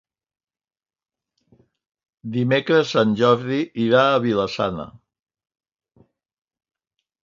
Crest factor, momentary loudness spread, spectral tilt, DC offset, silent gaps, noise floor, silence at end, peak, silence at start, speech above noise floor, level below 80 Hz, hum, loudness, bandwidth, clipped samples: 20 dB; 12 LU; -6.5 dB/octave; under 0.1%; none; under -90 dBFS; 2.3 s; -2 dBFS; 2.25 s; over 71 dB; -60 dBFS; none; -19 LUFS; 7.6 kHz; under 0.1%